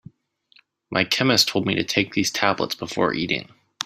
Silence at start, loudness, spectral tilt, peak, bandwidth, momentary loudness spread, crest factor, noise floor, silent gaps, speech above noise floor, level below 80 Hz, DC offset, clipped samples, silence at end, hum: 0.9 s; -21 LUFS; -3.5 dB/octave; -2 dBFS; 16 kHz; 8 LU; 22 dB; -60 dBFS; none; 38 dB; -60 dBFS; under 0.1%; under 0.1%; 0 s; none